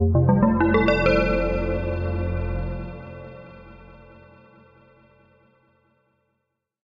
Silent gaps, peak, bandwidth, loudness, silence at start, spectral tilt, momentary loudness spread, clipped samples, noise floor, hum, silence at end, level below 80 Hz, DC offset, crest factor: none; -6 dBFS; 7.2 kHz; -22 LUFS; 0 s; -9 dB/octave; 22 LU; under 0.1%; -78 dBFS; none; 2.95 s; -34 dBFS; under 0.1%; 18 dB